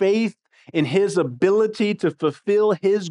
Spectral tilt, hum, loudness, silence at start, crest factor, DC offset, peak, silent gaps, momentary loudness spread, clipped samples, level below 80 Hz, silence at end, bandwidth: -6.5 dB/octave; none; -21 LUFS; 0 s; 14 dB; under 0.1%; -6 dBFS; none; 6 LU; under 0.1%; -72 dBFS; 0 s; 11 kHz